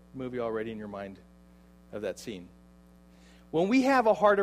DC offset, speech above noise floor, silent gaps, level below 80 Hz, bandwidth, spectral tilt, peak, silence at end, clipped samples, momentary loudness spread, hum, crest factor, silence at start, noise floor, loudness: under 0.1%; 28 dB; none; -60 dBFS; 13.5 kHz; -6 dB/octave; -10 dBFS; 0 s; under 0.1%; 20 LU; 60 Hz at -55 dBFS; 20 dB; 0.15 s; -56 dBFS; -29 LUFS